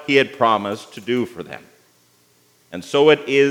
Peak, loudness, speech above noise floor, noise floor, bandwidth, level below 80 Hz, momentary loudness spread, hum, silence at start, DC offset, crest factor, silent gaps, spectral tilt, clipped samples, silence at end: 0 dBFS; -18 LUFS; 39 dB; -57 dBFS; 14 kHz; -72 dBFS; 21 LU; 60 Hz at -55 dBFS; 0 s; under 0.1%; 18 dB; none; -5 dB/octave; under 0.1%; 0 s